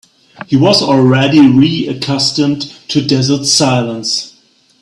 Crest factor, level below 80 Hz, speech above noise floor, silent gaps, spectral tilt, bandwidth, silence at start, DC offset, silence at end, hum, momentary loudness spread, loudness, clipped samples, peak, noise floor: 12 dB; -50 dBFS; 39 dB; none; -4.5 dB/octave; 12 kHz; 0.4 s; under 0.1%; 0.55 s; none; 9 LU; -11 LUFS; under 0.1%; 0 dBFS; -50 dBFS